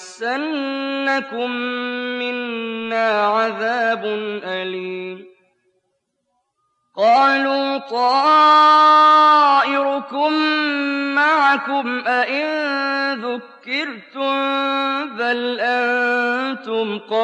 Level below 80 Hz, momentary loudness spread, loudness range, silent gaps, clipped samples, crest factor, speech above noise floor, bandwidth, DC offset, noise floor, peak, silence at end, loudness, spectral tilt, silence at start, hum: -84 dBFS; 14 LU; 9 LU; none; under 0.1%; 14 dB; 54 dB; 9.6 kHz; under 0.1%; -72 dBFS; -4 dBFS; 0 s; -17 LUFS; -3.5 dB/octave; 0 s; none